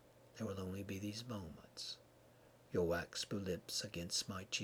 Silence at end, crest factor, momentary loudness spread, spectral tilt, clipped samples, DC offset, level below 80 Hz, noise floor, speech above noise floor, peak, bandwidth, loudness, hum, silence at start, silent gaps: 0 s; 18 dB; 10 LU; -3.5 dB/octave; under 0.1%; under 0.1%; -68 dBFS; -66 dBFS; 22 dB; -26 dBFS; over 20 kHz; -43 LUFS; none; 0 s; none